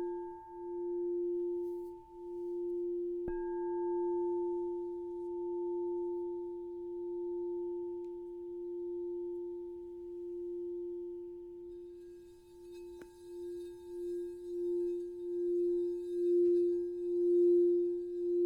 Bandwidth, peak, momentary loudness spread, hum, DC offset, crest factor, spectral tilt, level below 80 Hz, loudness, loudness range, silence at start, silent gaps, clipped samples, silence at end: 3.9 kHz; -22 dBFS; 17 LU; none; under 0.1%; 14 dB; -8 dB/octave; -66 dBFS; -37 LUFS; 13 LU; 0 s; none; under 0.1%; 0 s